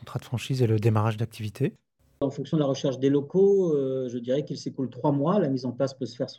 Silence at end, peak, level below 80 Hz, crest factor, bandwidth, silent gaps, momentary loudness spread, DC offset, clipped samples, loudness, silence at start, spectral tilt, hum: 0 s; -8 dBFS; -66 dBFS; 16 dB; 13.5 kHz; none; 10 LU; under 0.1%; under 0.1%; -26 LUFS; 0.05 s; -7.5 dB/octave; none